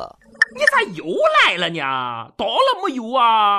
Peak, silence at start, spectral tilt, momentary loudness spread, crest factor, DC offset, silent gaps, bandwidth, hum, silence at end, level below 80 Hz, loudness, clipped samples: -2 dBFS; 0 s; -3 dB/octave; 10 LU; 16 dB; under 0.1%; none; 13.5 kHz; none; 0 s; -60 dBFS; -17 LUFS; under 0.1%